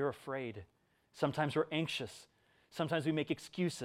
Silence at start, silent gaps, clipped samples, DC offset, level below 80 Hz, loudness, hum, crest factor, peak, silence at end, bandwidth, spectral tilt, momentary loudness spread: 0 s; none; under 0.1%; under 0.1%; -76 dBFS; -37 LUFS; none; 20 dB; -18 dBFS; 0 s; 15.5 kHz; -5.5 dB/octave; 13 LU